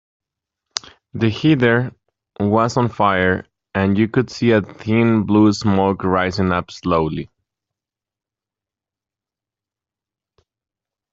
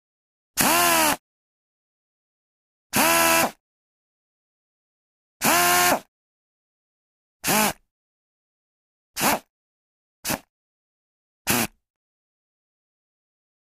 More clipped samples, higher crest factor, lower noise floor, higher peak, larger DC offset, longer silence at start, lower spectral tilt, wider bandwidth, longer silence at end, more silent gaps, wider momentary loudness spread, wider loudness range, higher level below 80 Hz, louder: neither; second, 18 dB vs 24 dB; about the same, -88 dBFS vs under -90 dBFS; about the same, 0 dBFS vs -2 dBFS; neither; first, 0.75 s vs 0.55 s; first, -6.5 dB/octave vs -1.5 dB/octave; second, 7.8 kHz vs 15.5 kHz; first, 3.85 s vs 2.05 s; second, none vs 1.19-2.90 s, 3.60-5.40 s, 6.08-7.40 s, 7.91-9.14 s, 9.50-10.23 s, 10.49-11.45 s; about the same, 13 LU vs 14 LU; about the same, 8 LU vs 9 LU; first, -52 dBFS vs -58 dBFS; first, -18 LUFS vs -21 LUFS